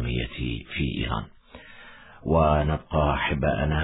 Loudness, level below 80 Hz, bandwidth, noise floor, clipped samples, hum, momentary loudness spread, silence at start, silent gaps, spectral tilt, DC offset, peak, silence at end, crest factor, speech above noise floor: -25 LUFS; -34 dBFS; 4 kHz; -47 dBFS; under 0.1%; none; 22 LU; 0 s; none; -10.5 dB/octave; under 0.1%; -8 dBFS; 0 s; 18 dB; 22 dB